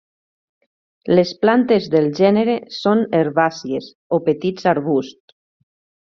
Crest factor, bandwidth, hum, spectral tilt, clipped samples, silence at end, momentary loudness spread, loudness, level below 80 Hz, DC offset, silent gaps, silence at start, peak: 16 dB; 7.2 kHz; none; -5 dB/octave; under 0.1%; 1 s; 10 LU; -18 LUFS; -60 dBFS; under 0.1%; 3.95-4.10 s; 1.05 s; -2 dBFS